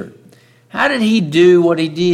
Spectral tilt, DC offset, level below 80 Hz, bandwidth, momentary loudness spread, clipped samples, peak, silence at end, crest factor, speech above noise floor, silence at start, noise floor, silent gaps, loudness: -6 dB/octave; under 0.1%; -60 dBFS; 10.5 kHz; 13 LU; under 0.1%; -2 dBFS; 0 s; 12 dB; 35 dB; 0 s; -47 dBFS; none; -13 LUFS